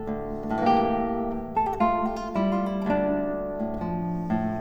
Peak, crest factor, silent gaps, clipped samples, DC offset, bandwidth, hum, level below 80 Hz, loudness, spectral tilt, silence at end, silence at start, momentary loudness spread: -8 dBFS; 18 dB; none; under 0.1%; under 0.1%; over 20 kHz; none; -44 dBFS; -26 LUFS; -8.5 dB/octave; 0 s; 0 s; 7 LU